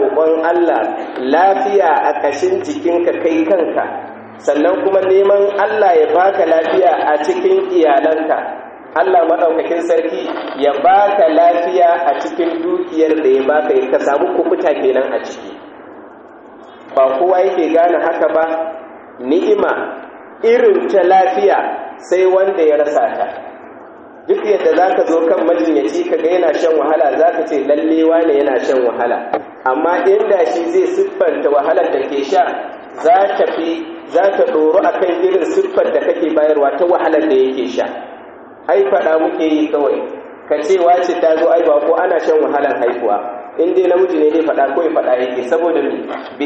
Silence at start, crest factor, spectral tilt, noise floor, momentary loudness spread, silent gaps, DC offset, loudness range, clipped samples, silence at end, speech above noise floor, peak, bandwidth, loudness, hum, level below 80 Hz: 0 s; 12 dB; -2.5 dB/octave; -37 dBFS; 9 LU; none; under 0.1%; 3 LU; under 0.1%; 0 s; 24 dB; 0 dBFS; 8 kHz; -14 LUFS; none; -62 dBFS